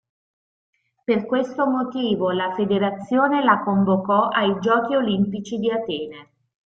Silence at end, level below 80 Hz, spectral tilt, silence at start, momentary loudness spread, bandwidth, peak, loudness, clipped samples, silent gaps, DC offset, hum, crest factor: 0.45 s; -62 dBFS; -7 dB/octave; 1.1 s; 7 LU; 7 kHz; -4 dBFS; -21 LUFS; under 0.1%; none; under 0.1%; none; 18 dB